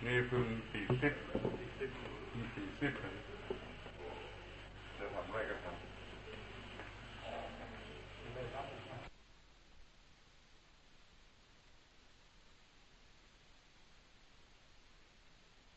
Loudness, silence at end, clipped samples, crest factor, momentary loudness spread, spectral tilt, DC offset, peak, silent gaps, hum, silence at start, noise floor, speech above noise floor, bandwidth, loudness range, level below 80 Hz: -44 LUFS; 0 s; under 0.1%; 26 dB; 27 LU; -6.5 dB/octave; under 0.1%; -20 dBFS; none; none; 0 s; -64 dBFS; 26 dB; 8.2 kHz; 24 LU; -60 dBFS